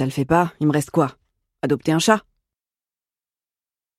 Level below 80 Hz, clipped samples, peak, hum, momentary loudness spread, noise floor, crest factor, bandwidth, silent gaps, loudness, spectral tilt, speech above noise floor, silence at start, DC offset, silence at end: -54 dBFS; under 0.1%; -2 dBFS; none; 6 LU; under -90 dBFS; 20 dB; 15.5 kHz; none; -20 LUFS; -5.5 dB/octave; over 71 dB; 0 s; under 0.1%; 1.8 s